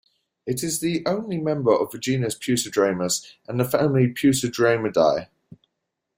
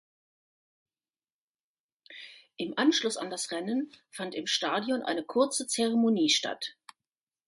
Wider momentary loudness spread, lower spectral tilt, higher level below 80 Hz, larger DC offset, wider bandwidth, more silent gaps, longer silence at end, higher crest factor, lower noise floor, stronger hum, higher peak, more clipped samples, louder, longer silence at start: second, 7 LU vs 16 LU; first, -5 dB/octave vs -2.5 dB/octave; first, -60 dBFS vs -80 dBFS; neither; first, 16.5 kHz vs 11.5 kHz; neither; first, 0.9 s vs 0.75 s; about the same, 18 dB vs 20 dB; second, -80 dBFS vs under -90 dBFS; neither; first, -6 dBFS vs -12 dBFS; neither; first, -22 LUFS vs -29 LUFS; second, 0.45 s vs 2.1 s